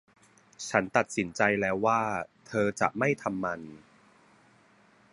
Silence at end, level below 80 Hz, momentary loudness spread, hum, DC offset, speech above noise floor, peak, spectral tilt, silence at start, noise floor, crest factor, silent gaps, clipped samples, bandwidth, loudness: 1.35 s; -64 dBFS; 10 LU; none; under 0.1%; 33 dB; -6 dBFS; -5 dB/octave; 0.6 s; -61 dBFS; 24 dB; none; under 0.1%; 11.5 kHz; -29 LUFS